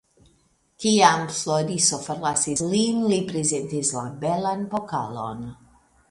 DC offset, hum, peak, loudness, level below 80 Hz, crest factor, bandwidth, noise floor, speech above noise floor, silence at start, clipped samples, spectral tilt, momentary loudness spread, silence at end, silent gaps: under 0.1%; none; -2 dBFS; -23 LUFS; -60 dBFS; 22 dB; 11.5 kHz; -64 dBFS; 40 dB; 0.8 s; under 0.1%; -3.5 dB/octave; 12 LU; 0.55 s; none